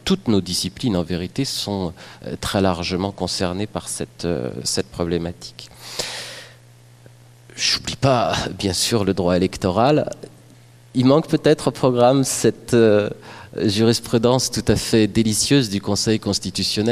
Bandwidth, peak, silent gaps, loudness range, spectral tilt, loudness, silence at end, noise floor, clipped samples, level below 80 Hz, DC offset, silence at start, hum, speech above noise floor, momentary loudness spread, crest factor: 15.5 kHz; -2 dBFS; none; 8 LU; -4.5 dB/octave; -20 LUFS; 0 s; -47 dBFS; under 0.1%; -46 dBFS; under 0.1%; 0.05 s; none; 28 dB; 13 LU; 18 dB